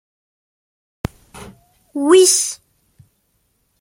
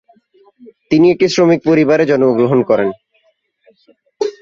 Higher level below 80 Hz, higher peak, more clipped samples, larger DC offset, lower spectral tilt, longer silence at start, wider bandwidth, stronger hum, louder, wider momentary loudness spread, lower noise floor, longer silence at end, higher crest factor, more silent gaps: about the same, -50 dBFS vs -54 dBFS; about the same, -2 dBFS vs -2 dBFS; neither; neither; second, -2.5 dB/octave vs -6.5 dB/octave; first, 1.35 s vs 0.9 s; first, 16.5 kHz vs 7.4 kHz; neither; about the same, -13 LUFS vs -13 LUFS; first, 21 LU vs 8 LU; first, -65 dBFS vs -60 dBFS; first, 1.25 s vs 0.1 s; about the same, 18 dB vs 14 dB; neither